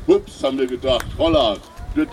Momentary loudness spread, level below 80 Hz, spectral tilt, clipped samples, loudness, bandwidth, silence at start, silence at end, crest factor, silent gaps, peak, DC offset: 8 LU; -34 dBFS; -5.5 dB/octave; under 0.1%; -20 LUFS; 15.5 kHz; 0 s; 0 s; 16 dB; none; -4 dBFS; under 0.1%